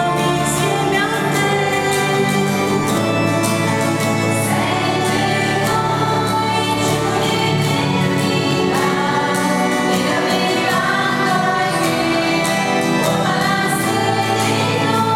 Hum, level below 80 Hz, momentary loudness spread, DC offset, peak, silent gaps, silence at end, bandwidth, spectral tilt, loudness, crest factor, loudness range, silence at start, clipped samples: none; -48 dBFS; 1 LU; under 0.1%; -4 dBFS; none; 0 s; 17.5 kHz; -4.5 dB/octave; -16 LUFS; 14 dB; 1 LU; 0 s; under 0.1%